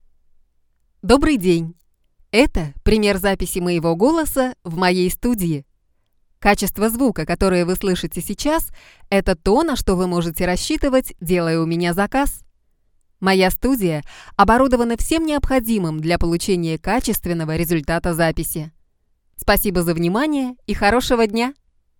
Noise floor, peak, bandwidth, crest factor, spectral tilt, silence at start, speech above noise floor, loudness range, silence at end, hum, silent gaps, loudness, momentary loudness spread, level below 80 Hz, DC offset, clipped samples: -62 dBFS; 0 dBFS; 19 kHz; 18 dB; -5 dB/octave; 1.05 s; 44 dB; 2 LU; 0.5 s; none; none; -19 LUFS; 7 LU; -32 dBFS; under 0.1%; under 0.1%